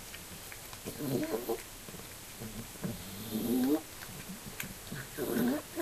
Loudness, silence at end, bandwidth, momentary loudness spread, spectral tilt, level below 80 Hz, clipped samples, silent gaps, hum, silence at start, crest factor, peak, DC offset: -37 LUFS; 0 s; 14.5 kHz; 13 LU; -4.5 dB/octave; -58 dBFS; under 0.1%; none; none; 0 s; 18 dB; -18 dBFS; under 0.1%